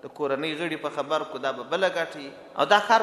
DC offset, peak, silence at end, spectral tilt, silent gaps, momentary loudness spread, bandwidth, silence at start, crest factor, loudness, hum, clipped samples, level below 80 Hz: under 0.1%; -4 dBFS; 0 s; -3.5 dB/octave; none; 10 LU; 13.5 kHz; 0.05 s; 22 dB; -26 LUFS; none; under 0.1%; -74 dBFS